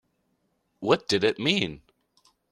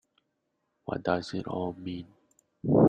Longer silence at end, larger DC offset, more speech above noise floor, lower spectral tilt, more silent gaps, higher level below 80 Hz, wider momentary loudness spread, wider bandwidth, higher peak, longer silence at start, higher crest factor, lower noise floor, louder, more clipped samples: first, 0.75 s vs 0 s; neither; about the same, 48 dB vs 46 dB; second, -4.5 dB/octave vs -8 dB/octave; neither; about the same, -62 dBFS vs -60 dBFS; second, 9 LU vs 13 LU; first, 13 kHz vs 9.4 kHz; first, -6 dBFS vs -10 dBFS; about the same, 0.8 s vs 0.9 s; about the same, 22 dB vs 20 dB; second, -73 dBFS vs -79 dBFS; first, -25 LUFS vs -33 LUFS; neither